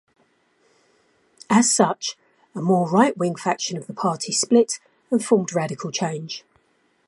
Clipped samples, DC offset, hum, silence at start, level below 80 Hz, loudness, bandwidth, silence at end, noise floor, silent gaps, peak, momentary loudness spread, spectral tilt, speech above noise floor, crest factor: under 0.1%; under 0.1%; none; 1.5 s; -72 dBFS; -21 LUFS; 11.5 kHz; 0.7 s; -65 dBFS; none; -2 dBFS; 13 LU; -4 dB/octave; 43 dB; 22 dB